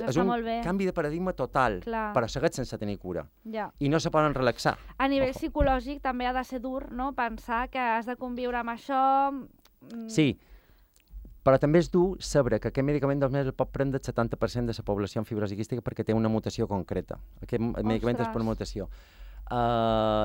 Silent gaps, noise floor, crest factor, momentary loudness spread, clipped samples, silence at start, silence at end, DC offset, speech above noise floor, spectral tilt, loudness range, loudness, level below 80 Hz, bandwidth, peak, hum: none; -60 dBFS; 20 dB; 10 LU; under 0.1%; 0 s; 0 s; under 0.1%; 33 dB; -6.5 dB/octave; 4 LU; -28 LUFS; -44 dBFS; 16.5 kHz; -8 dBFS; none